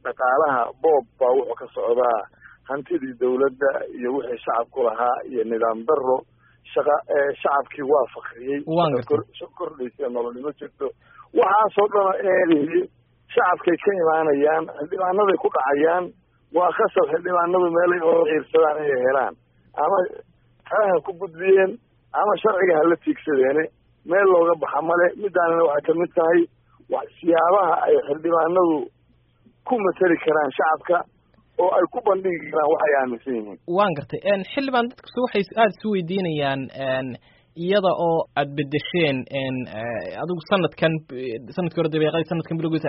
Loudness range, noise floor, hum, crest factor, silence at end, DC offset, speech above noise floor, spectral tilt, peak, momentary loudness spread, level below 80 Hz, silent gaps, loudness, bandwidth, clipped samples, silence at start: 4 LU; -60 dBFS; none; 16 dB; 0 s; under 0.1%; 39 dB; -4.5 dB/octave; -6 dBFS; 11 LU; -64 dBFS; none; -21 LUFS; 5.4 kHz; under 0.1%; 0.05 s